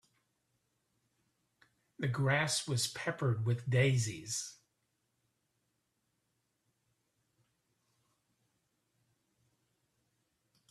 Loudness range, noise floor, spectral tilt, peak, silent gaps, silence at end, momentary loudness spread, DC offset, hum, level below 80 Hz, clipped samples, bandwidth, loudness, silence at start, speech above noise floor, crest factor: 10 LU; -82 dBFS; -4.5 dB/octave; -16 dBFS; none; 6.15 s; 9 LU; under 0.1%; none; -72 dBFS; under 0.1%; 13.5 kHz; -34 LUFS; 2 s; 49 dB; 22 dB